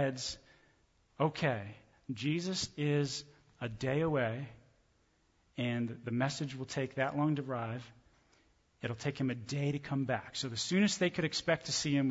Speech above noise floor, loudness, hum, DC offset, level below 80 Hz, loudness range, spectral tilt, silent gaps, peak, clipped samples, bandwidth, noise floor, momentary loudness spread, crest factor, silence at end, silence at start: 38 dB; -35 LUFS; none; under 0.1%; -66 dBFS; 4 LU; -5 dB/octave; none; -18 dBFS; under 0.1%; 8 kHz; -72 dBFS; 12 LU; 18 dB; 0 s; 0 s